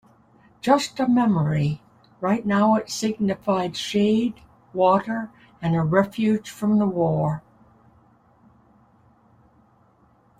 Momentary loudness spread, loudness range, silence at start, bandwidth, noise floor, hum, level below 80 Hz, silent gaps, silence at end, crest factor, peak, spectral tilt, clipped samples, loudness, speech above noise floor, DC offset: 10 LU; 5 LU; 0.65 s; 14.5 kHz; -59 dBFS; none; -58 dBFS; none; 3 s; 20 dB; -4 dBFS; -6.5 dB/octave; under 0.1%; -22 LUFS; 37 dB; under 0.1%